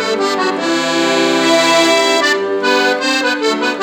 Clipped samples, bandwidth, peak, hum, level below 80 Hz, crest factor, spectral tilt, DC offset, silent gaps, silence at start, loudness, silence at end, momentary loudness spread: under 0.1%; 19 kHz; 0 dBFS; none; -62 dBFS; 14 dB; -2 dB/octave; under 0.1%; none; 0 s; -13 LUFS; 0 s; 5 LU